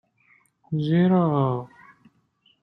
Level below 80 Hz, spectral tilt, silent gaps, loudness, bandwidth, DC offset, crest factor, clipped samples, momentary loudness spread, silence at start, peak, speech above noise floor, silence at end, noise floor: -64 dBFS; -10.5 dB/octave; none; -22 LUFS; 5.4 kHz; under 0.1%; 16 dB; under 0.1%; 13 LU; 0.7 s; -8 dBFS; 44 dB; 0.95 s; -65 dBFS